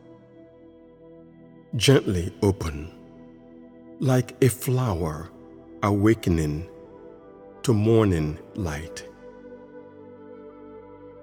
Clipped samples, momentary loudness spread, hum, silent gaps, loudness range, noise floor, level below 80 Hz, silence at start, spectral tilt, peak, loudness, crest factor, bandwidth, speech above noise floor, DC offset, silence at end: under 0.1%; 26 LU; none; none; 3 LU; -50 dBFS; -44 dBFS; 0.1 s; -6 dB/octave; -4 dBFS; -24 LUFS; 22 dB; 19 kHz; 27 dB; under 0.1%; 0 s